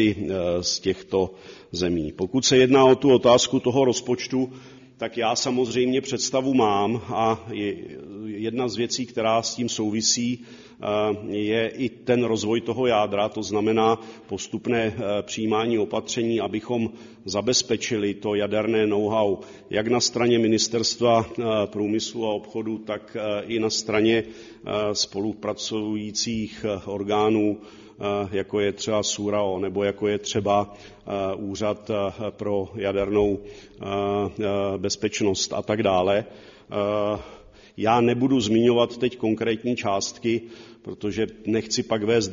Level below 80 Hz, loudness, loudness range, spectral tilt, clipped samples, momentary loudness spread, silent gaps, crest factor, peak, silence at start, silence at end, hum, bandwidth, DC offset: -56 dBFS; -24 LUFS; 6 LU; -4 dB/octave; under 0.1%; 10 LU; none; 20 dB; -4 dBFS; 0 s; 0 s; none; 7.6 kHz; under 0.1%